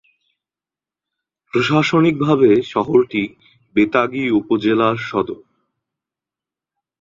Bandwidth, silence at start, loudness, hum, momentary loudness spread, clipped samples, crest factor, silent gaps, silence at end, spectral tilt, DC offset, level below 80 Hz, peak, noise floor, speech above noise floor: 7.6 kHz; 1.55 s; -17 LUFS; none; 9 LU; under 0.1%; 18 dB; none; 1.65 s; -7 dB/octave; under 0.1%; -56 dBFS; -2 dBFS; -90 dBFS; 74 dB